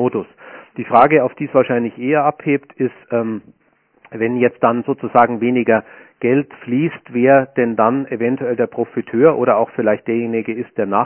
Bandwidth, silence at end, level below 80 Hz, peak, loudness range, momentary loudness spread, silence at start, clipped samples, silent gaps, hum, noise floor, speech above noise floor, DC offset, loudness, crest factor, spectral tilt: 4 kHz; 0 s; -62 dBFS; 0 dBFS; 3 LU; 10 LU; 0 s; under 0.1%; none; none; -52 dBFS; 36 dB; under 0.1%; -17 LUFS; 16 dB; -11 dB/octave